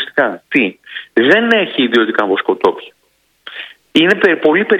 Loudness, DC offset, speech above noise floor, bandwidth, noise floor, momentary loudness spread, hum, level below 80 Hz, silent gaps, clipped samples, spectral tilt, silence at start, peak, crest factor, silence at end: -13 LUFS; under 0.1%; 46 dB; 10 kHz; -59 dBFS; 18 LU; none; -60 dBFS; none; 0.2%; -5.5 dB/octave; 0 s; 0 dBFS; 14 dB; 0 s